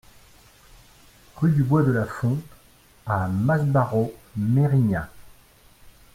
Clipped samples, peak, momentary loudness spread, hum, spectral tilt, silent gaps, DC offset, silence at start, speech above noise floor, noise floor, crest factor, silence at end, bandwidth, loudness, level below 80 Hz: under 0.1%; -8 dBFS; 10 LU; none; -9 dB/octave; none; under 0.1%; 1.35 s; 33 dB; -54 dBFS; 16 dB; 0.25 s; 15.5 kHz; -23 LUFS; -50 dBFS